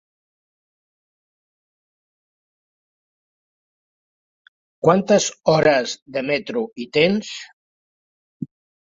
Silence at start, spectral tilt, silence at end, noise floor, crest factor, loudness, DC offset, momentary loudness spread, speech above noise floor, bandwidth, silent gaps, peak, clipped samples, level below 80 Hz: 4.85 s; -4.5 dB/octave; 0.4 s; under -90 dBFS; 22 dB; -19 LUFS; under 0.1%; 20 LU; over 71 dB; 7.8 kHz; 6.02-6.06 s, 7.53-8.40 s; -2 dBFS; under 0.1%; -62 dBFS